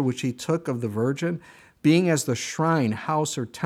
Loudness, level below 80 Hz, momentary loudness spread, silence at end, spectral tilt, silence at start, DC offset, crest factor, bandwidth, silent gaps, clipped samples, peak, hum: -24 LUFS; -66 dBFS; 8 LU; 0 s; -5.5 dB/octave; 0 s; under 0.1%; 16 dB; 15.5 kHz; none; under 0.1%; -8 dBFS; none